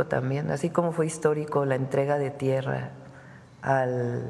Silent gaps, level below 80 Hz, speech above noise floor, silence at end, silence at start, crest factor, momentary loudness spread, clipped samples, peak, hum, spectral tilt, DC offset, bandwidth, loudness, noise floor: none; -64 dBFS; 22 dB; 0 s; 0 s; 18 dB; 9 LU; under 0.1%; -8 dBFS; none; -7 dB/octave; under 0.1%; 12 kHz; -27 LUFS; -48 dBFS